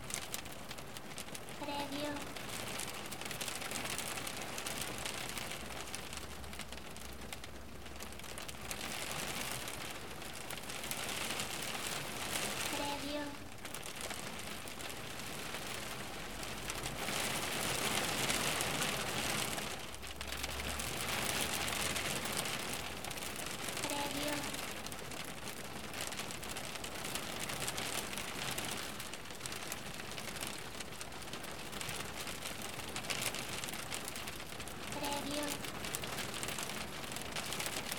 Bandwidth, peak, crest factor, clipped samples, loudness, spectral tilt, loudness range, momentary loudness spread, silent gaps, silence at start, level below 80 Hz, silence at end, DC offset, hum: over 20 kHz; -14 dBFS; 26 dB; under 0.1%; -40 LUFS; -2 dB/octave; 7 LU; 10 LU; none; 0 s; -58 dBFS; 0 s; 0.3%; none